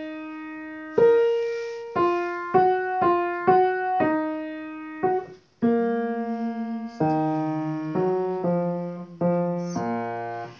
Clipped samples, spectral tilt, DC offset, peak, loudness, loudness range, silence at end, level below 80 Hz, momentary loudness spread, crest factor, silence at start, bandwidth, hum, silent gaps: under 0.1%; -8 dB/octave; under 0.1%; -6 dBFS; -24 LUFS; 4 LU; 0 s; -62 dBFS; 13 LU; 18 dB; 0 s; 6.8 kHz; none; none